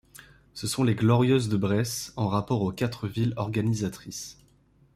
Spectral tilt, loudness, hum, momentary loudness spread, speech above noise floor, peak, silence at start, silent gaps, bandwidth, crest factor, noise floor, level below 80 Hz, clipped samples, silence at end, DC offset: -6 dB/octave; -27 LUFS; none; 15 LU; 35 dB; -8 dBFS; 0.55 s; none; 15 kHz; 18 dB; -61 dBFS; -56 dBFS; under 0.1%; 0.6 s; under 0.1%